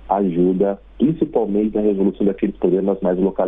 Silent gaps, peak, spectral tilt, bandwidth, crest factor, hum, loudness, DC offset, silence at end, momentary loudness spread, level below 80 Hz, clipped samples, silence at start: none; -4 dBFS; -11.5 dB/octave; 3.8 kHz; 14 dB; none; -19 LUFS; under 0.1%; 0 s; 3 LU; -44 dBFS; under 0.1%; 0.05 s